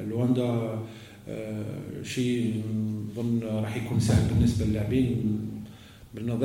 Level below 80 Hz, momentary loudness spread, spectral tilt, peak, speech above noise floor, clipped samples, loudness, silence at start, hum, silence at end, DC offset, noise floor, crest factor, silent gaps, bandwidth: -44 dBFS; 14 LU; -7 dB/octave; -10 dBFS; 20 dB; under 0.1%; -28 LUFS; 0 s; none; 0 s; under 0.1%; -47 dBFS; 18 dB; none; 16.5 kHz